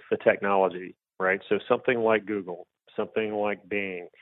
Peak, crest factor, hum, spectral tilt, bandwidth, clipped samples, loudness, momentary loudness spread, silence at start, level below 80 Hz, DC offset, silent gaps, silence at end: -6 dBFS; 20 dB; none; -9.5 dB/octave; 4.1 kHz; under 0.1%; -27 LUFS; 15 LU; 0.1 s; -68 dBFS; under 0.1%; none; 0.15 s